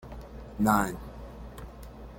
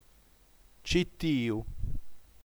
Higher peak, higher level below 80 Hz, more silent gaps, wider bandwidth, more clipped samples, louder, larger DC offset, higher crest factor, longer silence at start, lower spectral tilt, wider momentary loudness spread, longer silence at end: first, -10 dBFS vs -14 dBFS; about the same, -46 dBFS vs -42 dBFS; neither; second, 17 kHz vs over 20 kHz; neither; first, -27 LUFS vs -32 LUFS; neither; about the same, 22 dB vs 20 dB; second, 0 s vs 0.85 s; about the same, -6 dB/octave vs -5.5 dB/octave; first, 20 LU vs 14 LU; second, 0 s vs 0.15 s